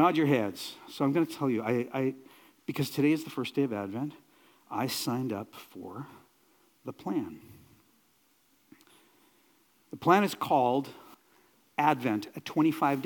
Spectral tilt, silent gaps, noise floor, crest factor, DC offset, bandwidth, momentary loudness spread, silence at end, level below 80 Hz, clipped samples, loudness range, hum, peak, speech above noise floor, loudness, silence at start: -6 dB/octave; none; -68 dBFS; 24 dB; under 0.1%; 18 kHz; 19 LU; 0 s; -80 dBFS; under 0.1%; 13 LU; none; -8 dBFS; 39 dB; -30 LUFS; 0 s